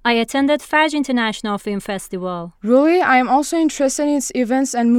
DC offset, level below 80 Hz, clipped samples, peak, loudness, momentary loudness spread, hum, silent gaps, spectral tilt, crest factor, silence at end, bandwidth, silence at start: under 0.1%; -52 dBFS; under 0.1%; -2 dBFS; -17 LUFS; 11 LU; none; none; -3.5 dB/octave; 14 dB; 0 s; 16 kHz; 0.05 s